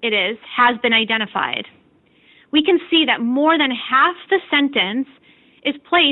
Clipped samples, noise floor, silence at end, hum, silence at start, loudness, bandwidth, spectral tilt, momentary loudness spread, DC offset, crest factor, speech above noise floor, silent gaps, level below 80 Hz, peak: under 0.1%; -55 dBFS; 0 s; none; 0 s; -17 LUFS; 4.2 kHz; -7.5 dB/octave; 10 LU; under 0.1%; 16 dB; 37 dB; none; -64 dBFS; -4 dBFS